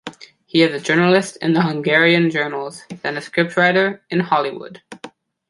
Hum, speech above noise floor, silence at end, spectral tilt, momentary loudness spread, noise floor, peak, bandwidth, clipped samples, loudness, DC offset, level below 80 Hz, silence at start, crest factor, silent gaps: none; 20 dB; 0.4 s; -5.5 dB/octave; 20 LU; -37 dBFS; -2 dBFS; 11.5 kHz; under 0.1%; -17 LUFS; under 0.1%; -64 dBFS; 0.05 s; 16 dB; none